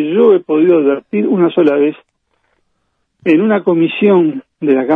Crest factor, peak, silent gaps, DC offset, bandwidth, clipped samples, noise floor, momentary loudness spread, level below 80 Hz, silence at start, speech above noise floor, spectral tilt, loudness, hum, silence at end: 12 dB; 0 dBFS; none; under 0.1%; 4 kHz; under 0.1%; -66 dBFS; 6 LU; -64 dBFS; 0 s; 55 dB; -9.5 dB/octave; -12 LUFS; none; 0 s